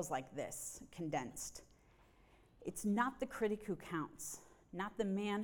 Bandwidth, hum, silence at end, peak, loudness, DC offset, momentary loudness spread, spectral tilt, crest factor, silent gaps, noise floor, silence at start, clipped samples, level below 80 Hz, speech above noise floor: over 20 kHz; none; 0 s; -22 dBFS; -42 LUFS; under 0.1%; 11 LU; -4.5 dB/octave; 20 dB; none; -68 dBFS; 0 s; under 0.1%; -68 dBFS; 26 dB